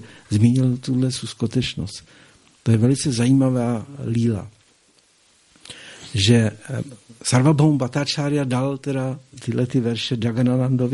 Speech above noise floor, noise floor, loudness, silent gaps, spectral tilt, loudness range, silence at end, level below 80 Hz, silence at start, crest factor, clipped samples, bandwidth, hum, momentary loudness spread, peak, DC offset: 38 dB; -58 dBFS; -21 LUFS; none; -6 dB/octave; 4 LU; 0 s; -52 dBFS; 0 s; 20 dB; under 0.1%; 11.5 kHz; none; 13 LU; -2 dBFS; under 0.1%